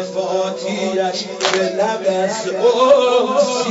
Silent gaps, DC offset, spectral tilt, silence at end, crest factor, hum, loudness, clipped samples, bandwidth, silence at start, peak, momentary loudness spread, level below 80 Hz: none; under 0.1%; -3.5 dB/octave; 0 s; 16 dB; none; -17 LUFS; under 0.1%; 8 kHz; 0 s; 0 dBFS; 8 LU; -66 dBFS